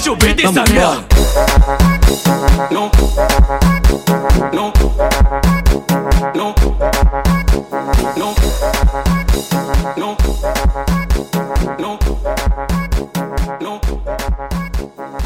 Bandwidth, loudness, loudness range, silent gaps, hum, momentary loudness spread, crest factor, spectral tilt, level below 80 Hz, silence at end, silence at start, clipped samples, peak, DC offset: 16.5 kHz; -15 LUFS; 7 LU; none; none; 9 LU; 12 dB; -5 dB/octave; -16 dBFS; 0 s; 0 s; under 0.1%; 0 dBFS; under 0.1%